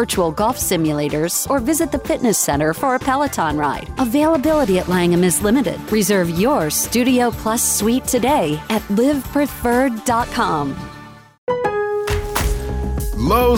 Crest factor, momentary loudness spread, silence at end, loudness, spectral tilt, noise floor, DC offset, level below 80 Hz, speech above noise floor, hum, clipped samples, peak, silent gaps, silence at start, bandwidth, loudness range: 14 dB; 6 LU; 0 s; -18 LUFS; -4.5 dB/octave; -39 dBFS; under 0.1%; -32 dBFS; 22 dB; none; under 0.1%; -4 dBFS; 11.38-11.47 s; 0 s; 17 kHz; 4 LU